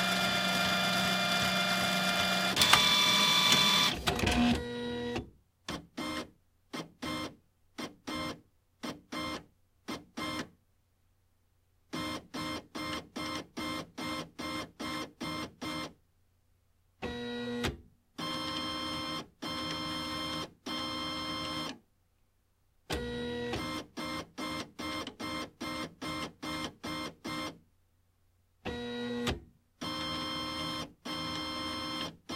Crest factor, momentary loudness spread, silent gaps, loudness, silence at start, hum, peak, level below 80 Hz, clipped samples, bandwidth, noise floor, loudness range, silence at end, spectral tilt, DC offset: 30 dB; 17 LU; none; -32 LUFS; 0 s; none; -4 dBFS; -54 dBFS; under 0.1%; 16 kHz; -72 dBFS; 16 LU; 0 s; -2.5 dB/octave; under 0.1%